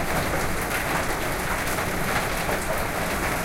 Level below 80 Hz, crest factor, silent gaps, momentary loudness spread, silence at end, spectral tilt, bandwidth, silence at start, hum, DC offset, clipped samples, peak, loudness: -34 dBFS; 14 dB; none; 1 LU; 0 s; -3.5 dB/octave; 16.5 kHz; 0 s; none; under 0.1%; under 0.1%; -10 dBFS; -25 LUFS